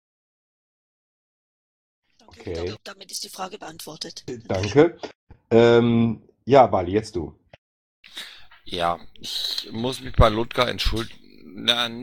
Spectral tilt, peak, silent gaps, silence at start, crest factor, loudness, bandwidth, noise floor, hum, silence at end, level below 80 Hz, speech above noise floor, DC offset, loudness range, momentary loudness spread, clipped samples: -5.5 dB/octave; -2 dBFS; 5.15-5.27 s, 7.58-8.03 s; 2.4 s; 22 dB; -22 LUFS; 18 kHz; -41 dBFS; none; 0 s; -36 dBFS; 19 dB; under 0.1%; 16 LU; 21 LU; under 0.1%